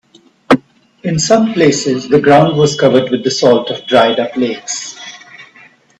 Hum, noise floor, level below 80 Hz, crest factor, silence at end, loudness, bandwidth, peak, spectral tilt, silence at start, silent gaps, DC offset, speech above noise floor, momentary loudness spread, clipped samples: none; -44 dBFS; -50 dBFS; 12 dB; 0.55 s; -12 LUFS; 10.5 kHz; 0 dBFS; -4.5 dB/octave; 0.5 s; none; under 0.1%; 33 dB; 12 LU; under 0.1%